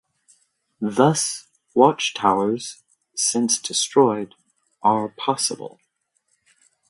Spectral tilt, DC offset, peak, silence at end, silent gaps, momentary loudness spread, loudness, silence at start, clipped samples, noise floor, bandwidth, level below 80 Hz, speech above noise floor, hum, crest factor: -3.5 dB/octave; under 0.1%; 0 dBFS; 1.2 s; none; 16 LU; -20 LUFS; 0.8 s; under 0.1%; -71 dBFS; 11.5 kHz; -68 dBFS; 50 dB; none; 22 dB